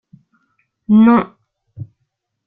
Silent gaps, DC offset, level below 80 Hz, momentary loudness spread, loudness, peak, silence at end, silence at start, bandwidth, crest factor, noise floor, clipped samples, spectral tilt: none; under 0.1%; -58 dBFS; 26 LU; -12 LUFS; -2 dBFS; 0.65 s; 0.9 s; 3.8 kHz; 16 dB; -72 dBFS; under 0.1%; -11.5 dB/octave